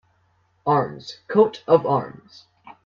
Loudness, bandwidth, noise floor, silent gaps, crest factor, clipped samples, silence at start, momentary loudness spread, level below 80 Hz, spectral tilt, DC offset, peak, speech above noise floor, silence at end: -21 LUFS; 7.2 kHz; -64 dBFS; none; 20 dB; under 0.1%; 0.65 s; 14 LU; -64 dBFS; -7.5 dB/octave; under 0.1%; -2 dBFS; 43 dB; 0.15 s